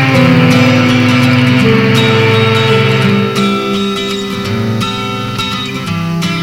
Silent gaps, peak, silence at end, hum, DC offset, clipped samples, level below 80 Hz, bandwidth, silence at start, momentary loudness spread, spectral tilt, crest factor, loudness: none; 0 dBFS; 0 s; none; under 0.1%; under 0.1%; -40 dBFS; 16.5 kHz; 0 s; 9 LU; -6 dB/octave; 10 dB; -10 LUFS